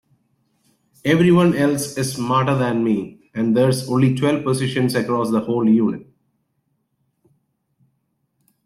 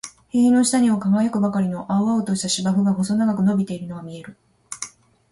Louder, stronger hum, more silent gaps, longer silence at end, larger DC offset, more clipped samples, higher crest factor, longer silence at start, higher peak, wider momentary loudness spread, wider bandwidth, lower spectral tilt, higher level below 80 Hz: about the same, -18 LUFS vs -20 LUFS; neither; neither; first, 2.6 s vs 0.45 s; neither; neither; about the same, 16 dB vs 12 dB; first, 1.05 s vs 0.05 s; first, -4 dBFS vs -8 dBFS; second, 9 LU vs 17 LU; first, 14 kHz vs 11.5 kHz; about the same, -6.5 dB/octave vs -5.5 dB/octave; about the same, -58 dBFS vs -60 dBFS